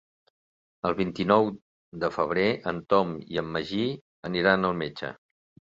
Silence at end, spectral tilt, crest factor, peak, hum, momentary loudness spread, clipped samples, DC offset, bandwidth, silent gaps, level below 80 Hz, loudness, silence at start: 0.55 s; -7 dB/octave; 22 dB; -6 dBFS; none; 13 LU; under 0.1%; under 0.1%; 7.6 kHz; 1.62-1.92 s, 4.01-4.23 s; -58 dBFS; -27 LUFS; 0.85 s